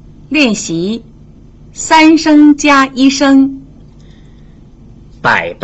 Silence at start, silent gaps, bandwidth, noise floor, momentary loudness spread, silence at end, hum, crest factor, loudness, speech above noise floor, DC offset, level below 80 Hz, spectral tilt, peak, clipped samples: 0.3 s; none; 8.2 kHz; -37 dBFS; 12 LU; 0.1 s; 50 Hz at -40 dBFS; 12 dB; -9 LUFS; 29 dB; under 0.1%; -40 dBFS; -3.5 dB/octave; 0 dBFS; under 0.1%